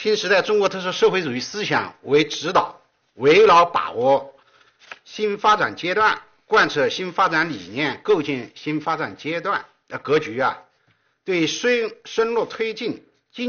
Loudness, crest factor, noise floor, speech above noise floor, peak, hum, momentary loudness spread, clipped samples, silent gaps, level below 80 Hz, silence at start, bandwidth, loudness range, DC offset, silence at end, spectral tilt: -20 LUFS; 16 dB; -64 dBFS; 44 dB; -6 dBFS; none; 11 LU; under 0.1%; none; -62 dBFS; 0 s; 6.8 kHz; 5 LU; under 0.1%; 0 s; -2 dB/octave